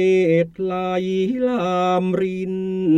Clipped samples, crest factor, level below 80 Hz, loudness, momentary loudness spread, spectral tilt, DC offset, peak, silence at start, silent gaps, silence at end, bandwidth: under 0.1%; 12 dB; -56 dBFS; -20 LUFS; 7 LU; -7.5 dB/octave; under 0.1%; -6 dBFS; 0 s; none; 0 s; 8.6 kHz